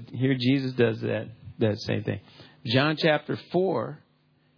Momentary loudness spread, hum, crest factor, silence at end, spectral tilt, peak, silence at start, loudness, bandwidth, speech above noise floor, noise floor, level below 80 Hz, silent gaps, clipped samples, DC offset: 12 LU; none; 18 dB; 0.6 s; -7.5 dB/octave; -8 dBFS; 0 s; -26 LUFS; 5.4 kHz; 39 dB; -65 dBFS; -66 dBFS; none; under 0.1%; under 0.1%